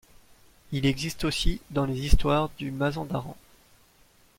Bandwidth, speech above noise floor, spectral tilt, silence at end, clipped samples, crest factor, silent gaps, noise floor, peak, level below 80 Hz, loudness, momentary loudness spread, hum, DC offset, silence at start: 16.5 kHz; 35 dB; -5.5 dB/octave; 1.05 s; under 0.1%; 24 dB; none; -60 dBFS; -4 dBFS; -32 dBFS; -28 LUFS; 9 LU; none; under 0.1%; 0.7 s